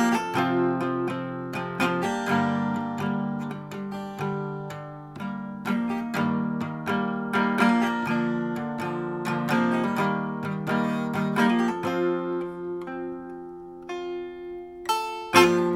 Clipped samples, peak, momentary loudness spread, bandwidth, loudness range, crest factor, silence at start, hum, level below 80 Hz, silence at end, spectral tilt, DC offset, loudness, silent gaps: under 0.1%; -2 dBFS; 13 LU; 17 kHz; 6 LU; 24 dB; 0 s; none; -64 dBFS; 0 s; -5.5 dB/octave; under 0.1%; -26 LUFS; none